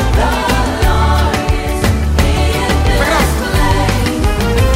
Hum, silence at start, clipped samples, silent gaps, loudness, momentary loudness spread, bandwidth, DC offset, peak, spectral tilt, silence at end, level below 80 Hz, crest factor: none; 0 s; under 0.1%; none; -13 LUFS; 3 LU; 16.5 kHz; under 0.1%; 0 dBFS; -5 dB/octave; 0 s; -16 dBFS; 12 dB